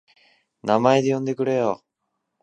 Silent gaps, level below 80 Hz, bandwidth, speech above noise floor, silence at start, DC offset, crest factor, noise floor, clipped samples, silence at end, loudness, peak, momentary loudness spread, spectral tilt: none; -66 dBFS; 9.6 kHz; 58 dB; 0.65 s; under 0.1%; 22 dB; -78 dBFS; under 0.1%; 0.65 s; -21 LUFS; -2 dBFS; 12 LU; -6.5 dB/octave